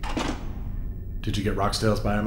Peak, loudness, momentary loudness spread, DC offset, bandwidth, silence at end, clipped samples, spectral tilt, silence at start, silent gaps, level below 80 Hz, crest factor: -10 dBFS; -28 LUFS; 12 LU; under 0.1%; 16 kHz; 0 s; under 0.1%; -5.5 dB/octave; 0 s; none; -32 dBFS; 16 dB